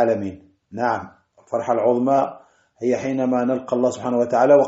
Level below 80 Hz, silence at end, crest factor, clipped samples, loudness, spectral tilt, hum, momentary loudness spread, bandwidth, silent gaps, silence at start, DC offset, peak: -64 dBFS; 0 s; 18 dB; under 0.1%; -21 LUFS; -6.5 dB/octave; none; 10 LU; 8 kHz; none; 0 s; under 0.1%; -2 dBFS